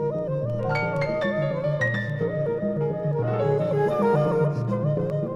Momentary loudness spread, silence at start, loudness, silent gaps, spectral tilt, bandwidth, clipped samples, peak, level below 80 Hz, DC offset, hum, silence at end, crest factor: 5 LU; 0 s; -25 LUFS; none; -8.5 dB/octave; 7.2 kHz; under 0.1%; -10 dBFS; -54 dBFS; under 0.1%; none; 0 s; 14 dB